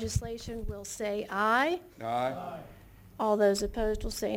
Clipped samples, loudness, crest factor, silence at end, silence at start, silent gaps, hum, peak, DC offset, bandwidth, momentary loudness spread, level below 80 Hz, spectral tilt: under 0.1%; -31 LUFS; 18 dB; 0 s; 0 s; none; none; -14 dBFS; under 0.1%; 17 kHz; 13 LU; -44 dBFS; -4.5 dB/octave